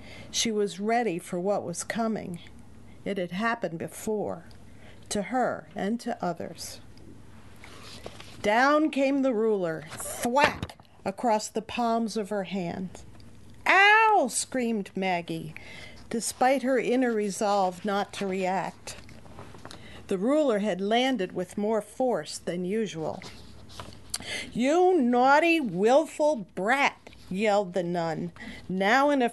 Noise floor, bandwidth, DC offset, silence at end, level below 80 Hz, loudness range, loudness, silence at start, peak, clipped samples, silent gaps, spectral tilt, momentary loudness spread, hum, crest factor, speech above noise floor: -50 dBFS; 12.5 kHz; 0.2%; 0 s; -58 dBFS; 8 LU; -26 LUFS; 0 s; -4 dBFS; under 0.1%; none; -4 dB/octave; 20 LU; none; 22 dB; 24 dB